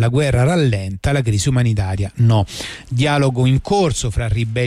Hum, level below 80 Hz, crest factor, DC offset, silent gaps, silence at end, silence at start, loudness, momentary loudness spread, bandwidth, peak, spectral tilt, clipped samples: none; -32 dBFS; 10 dB; under 0.1%; none; 0 s; 0 s; -17 LUFS; 6 LU; 12.5 kHz; -6 dBFS; -6 dB/octave; under 0.1%